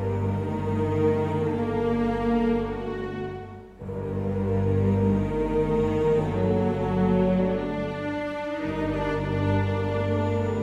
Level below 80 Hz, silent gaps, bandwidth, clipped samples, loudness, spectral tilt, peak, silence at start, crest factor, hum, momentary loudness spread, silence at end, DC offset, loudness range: -42 dBFS; none; 8 kHz; under 0.1%; -26 LUFS; -9 dB/octave; -12 dBFS; 0 s; 14 dB; 50 Hz at -45 dBFS; 8 LU; 0 s; under 0.1%; 3 LU